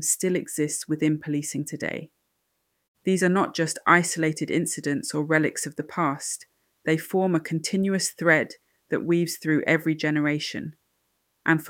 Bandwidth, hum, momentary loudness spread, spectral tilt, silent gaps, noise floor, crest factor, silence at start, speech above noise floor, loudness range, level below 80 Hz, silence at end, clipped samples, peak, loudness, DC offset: 17 kHz; none; 10 LU; -4.5 dB/octave; 2.88-2.95 s; -75 dBFS; 22 dB; 0 s; 50 dB; 3 LU; -70 dBFS; 0 s; under 0.1%; -4 dBFS; -25 LUFS; under 0.1%